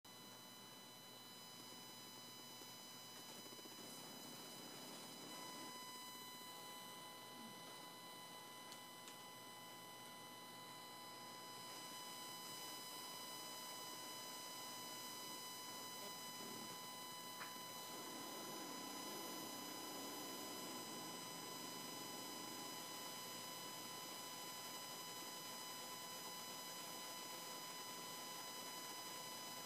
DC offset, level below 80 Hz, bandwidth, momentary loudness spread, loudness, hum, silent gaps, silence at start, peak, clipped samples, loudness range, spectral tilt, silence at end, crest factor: under 0.1%; under -90 dBFS; 15.5 kHz; 6 LU; -51 LUFS; none; none; 0.05 s; -38 dBFS; under 0.1%; 5 LU; -1.5 dB/octave; 0 s; 16 dB